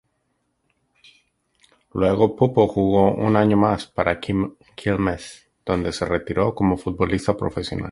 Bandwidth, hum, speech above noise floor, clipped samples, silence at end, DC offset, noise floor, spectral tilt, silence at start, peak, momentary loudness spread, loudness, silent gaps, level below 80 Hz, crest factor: 11.5 kHz; none; 51 dB; under 0.1%; 0 s; under 0.1%; -71 dBFS; -7 dB/octave; 1.95 s; -2 dBFS; 10 LU; -21 LUFS; none; -42 dBFS; 20 dB